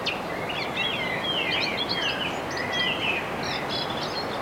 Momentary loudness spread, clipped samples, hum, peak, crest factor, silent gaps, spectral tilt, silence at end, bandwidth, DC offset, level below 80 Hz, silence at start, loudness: 5 LU; under 0.1%; none; -14 dBFS; 14 dB; none; -3.5 dB/octave; 0 s; 16.5 kHz; under 0.1%; -54 dBFS; 0 s; -26 LUFS